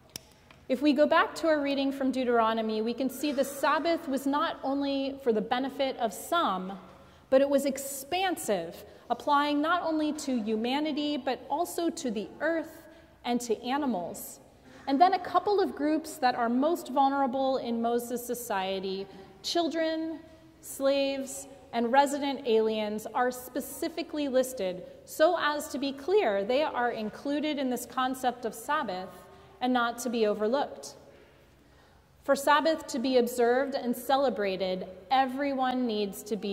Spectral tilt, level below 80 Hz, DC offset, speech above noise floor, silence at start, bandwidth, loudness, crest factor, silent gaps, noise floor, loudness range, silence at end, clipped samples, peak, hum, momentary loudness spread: -4 dB/octave; -66 dBFS; under 0.1%; 30 dB; 0.7 s; 16 kHz; -29 LUFS; 20 dB; none; -59 dBFS; 4 LU; 0 s; under 0.1%; -10 dBFS; none; 11 LU